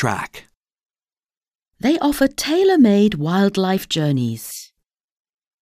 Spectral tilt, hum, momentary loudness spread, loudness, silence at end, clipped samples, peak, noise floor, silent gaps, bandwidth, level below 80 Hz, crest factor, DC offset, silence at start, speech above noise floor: -5.5 dB/octave; none; 16 LU; -18 LUFS; 0.95 s; under 0.1%; -2 dBFS; under -90 dBFS; 0.57-0.61 s, 1.37-1.41 s, 1.55-1.60 s; 16 kHz; -50 dBFS; 18 dB; under 0.1%; 0 s; over 73 dB